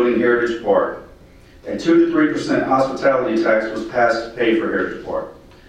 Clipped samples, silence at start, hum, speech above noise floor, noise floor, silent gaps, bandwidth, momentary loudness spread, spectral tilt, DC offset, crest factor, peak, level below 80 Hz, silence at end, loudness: under 0.1%; 0 s; none; 27 dB; -45 dBFS; none; 9 kHz; 11 LU; -6 dB/octave; under 0.1%; 14 dB; -4 dBFS; -48 dBFS; 0.35 s; -18 LUFS